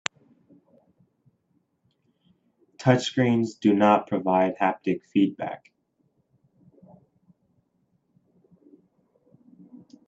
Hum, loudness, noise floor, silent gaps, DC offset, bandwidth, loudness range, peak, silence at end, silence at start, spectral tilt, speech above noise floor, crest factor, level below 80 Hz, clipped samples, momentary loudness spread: none; -24 LUFS; -71 dBFS; none; under 0.1%; 8 kHz; 9 LU; -2 dBFS; 0.3 s; 2.8 s; -6.5 dB/octave; 48 dB; 26 dB; -70 dBFS; under 0.1%; 13 LU